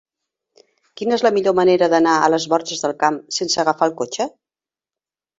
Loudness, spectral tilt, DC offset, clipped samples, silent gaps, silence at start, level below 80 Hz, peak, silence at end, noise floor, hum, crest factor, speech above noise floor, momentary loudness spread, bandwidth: -18 LUFS; -3.5 dB/octave; under 0.1%; under 0.1%; none; 0.95 s; -64 dBFS; -2 dBFS; 1.1 s; under -90 dBFS; none; 18 dB; over 73 dB; 9 LU; 8 kHz